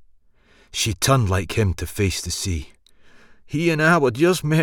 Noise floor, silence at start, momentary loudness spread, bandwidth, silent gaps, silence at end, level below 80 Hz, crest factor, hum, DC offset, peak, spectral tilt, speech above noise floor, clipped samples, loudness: -55 dBFS; 0.75 s; 10 LU; 19 kHz; none; 0 s; -40 dBFS; 18 dB; none; under 0.1%; -2 dBFS; -5 dB/octave; 35 dB; under 0.1%; -21 LUFS